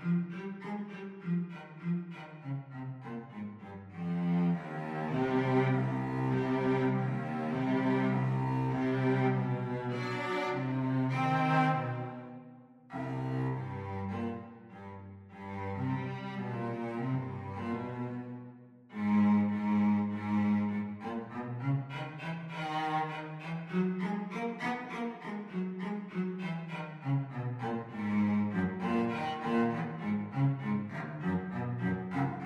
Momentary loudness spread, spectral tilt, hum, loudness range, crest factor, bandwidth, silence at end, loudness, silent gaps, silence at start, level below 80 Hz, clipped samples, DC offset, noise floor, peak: 13 LU; -8.5 dB/octave; none; 8 LU; 16 dB; 8.4 kHz; 0 s; -34 LUFS; none; 0 s; -68 dBFS; under 0.1%; under 0.1%; -54 dBFS; -16 dBFS